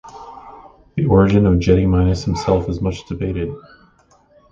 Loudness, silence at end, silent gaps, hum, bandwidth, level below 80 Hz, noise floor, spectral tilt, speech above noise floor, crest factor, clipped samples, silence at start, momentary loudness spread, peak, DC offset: -17 LUFS; 0.9 s; none; none; 7.6 kHz; -30 dBFS; -54 dBFS; -8 dB/octave; 38 dB; 18 dB; under 0.1%; 0.05 s; 23 LU; 0 dBFS; under 0.1%